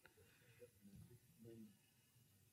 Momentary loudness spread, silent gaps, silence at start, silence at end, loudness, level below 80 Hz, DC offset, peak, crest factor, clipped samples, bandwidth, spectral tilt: 5 LU; none; 0 s; 0 s; -65 LUFS; -86 dBFS; under 0.1%; -48 dBFS; 20 dB; under 0.1%; 16 kHz; -5.5 dB/octave